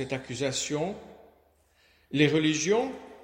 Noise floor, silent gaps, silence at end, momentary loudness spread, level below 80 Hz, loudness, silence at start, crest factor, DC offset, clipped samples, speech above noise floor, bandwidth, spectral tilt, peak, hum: -64 dBFS; none; 0 s; 12 LU; -62 dBFS; -27 LUFS; 0 s; 22 dB; under 0.1%; under 0.1%; 37 dB; 16 kHz; -4 dB/octave; -8 dBFS; none